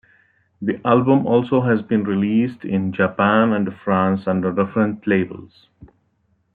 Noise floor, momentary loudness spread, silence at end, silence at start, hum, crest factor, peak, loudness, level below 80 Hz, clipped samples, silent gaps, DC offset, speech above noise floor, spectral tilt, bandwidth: -65 dBFS; 7 LU; 0.7 s; 0.6 s; none; 16 dB; -2 dBFS; -19 LUFS; -60 dBFS; under 0.1%; none; under 0.1%; 46 dB; -10.5 dB/octave; 4.5 kHz